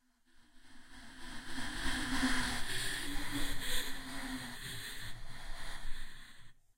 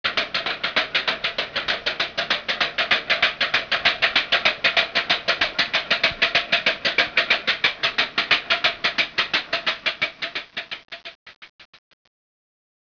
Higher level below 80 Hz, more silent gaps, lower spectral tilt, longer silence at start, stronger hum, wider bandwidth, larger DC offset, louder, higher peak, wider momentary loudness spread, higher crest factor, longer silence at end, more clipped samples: first, -44 dBFS vs -56 dBFS; second, none vs 11.15-11.26 s, 11.36-11.42 s, 11.49-11.59 s; about the same, -2.5 dB/octave vs -1.5 dB/octave; first, 0.4 s vs 0.05 s; neither; first, 16 kHz vs 5.4 kHz; neither; second, -40 LUFS vs -20 LUFS; second, -20 dBFS vs -4 dBFS; first, 18 LU vs 7 LU; about the same, 16 dB vs 20 dB; second, 0.25 s vs 1.2 s; neither